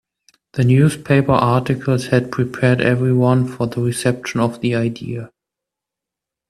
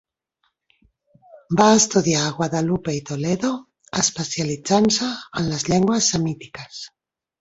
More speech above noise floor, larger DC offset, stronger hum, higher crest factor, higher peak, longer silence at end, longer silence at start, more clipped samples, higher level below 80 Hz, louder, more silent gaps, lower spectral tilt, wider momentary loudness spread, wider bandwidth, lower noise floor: first, 69 dB vs 51 dB; neither; neither; about the same, 18 dB vs 20 dB; about the same, 0 dBFS vs -2 dBFS; first, 1.2 s vs 0.55 s; second, 0.55 s vs 1.35 s; neither; about the same, -50 dBFS vs -54 dBFS; first, -17 LUFS vs -20 LUFS; neither; first, -7 dB/octave vs -4 dB/octave; second, 8 LU vs 17 LU; first, 13 kHz vs 8.2 kHz; first, -85 dBFS vs -71 dBFS